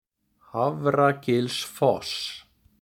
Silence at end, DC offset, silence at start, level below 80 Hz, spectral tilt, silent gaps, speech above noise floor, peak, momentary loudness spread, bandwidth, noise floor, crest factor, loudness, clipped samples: 0.4 s; under 0.1%; 0.55 s; -64 dBFS; -5 dB/octave; none; 36 dB; -8 dBFS; 12 LU; 18.5 kHz; -60 dBFS; 18 dB; -25 LUFS; under 0.1%